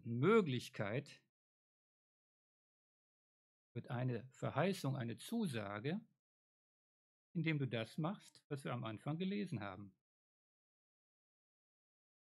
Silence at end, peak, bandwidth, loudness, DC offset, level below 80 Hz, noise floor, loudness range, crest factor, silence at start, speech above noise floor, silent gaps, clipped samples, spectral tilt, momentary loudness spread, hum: 2.4 s; -20 dBFS; 13.5 kHz; -42 LUFS; under 0.1%; under -90 dBFS; under -90 dBFS; 7 LU; 24 dB; 0.05 s; over 49 dB; 1.29-3.75 s, 6.19-7.35 s, 8.44-8.50 s; under 0.1%; -7 dB/octave; 15 LU; none